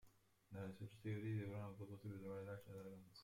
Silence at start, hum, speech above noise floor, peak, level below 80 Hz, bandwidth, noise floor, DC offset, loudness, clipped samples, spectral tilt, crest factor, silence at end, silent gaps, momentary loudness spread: 0.05 s; none; 21 dB; -38 dBFS; -80 dBFS; 16 kHz; -72 dBFS; under 0.1%; -52 LUFS; under 0.1%; -8 dB/octave; 14 dB; 0 s; none; 10 LU